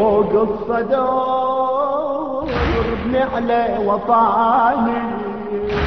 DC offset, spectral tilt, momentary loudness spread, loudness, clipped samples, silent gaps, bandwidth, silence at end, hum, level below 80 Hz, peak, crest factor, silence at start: 0.6%; -8 dB/octave; 8 LU; -18 LUFS; under 0.1%; none; 6.2 kHz; 0 s; none; -36 dBFS; -4 dBFS; 14 dB; 0 s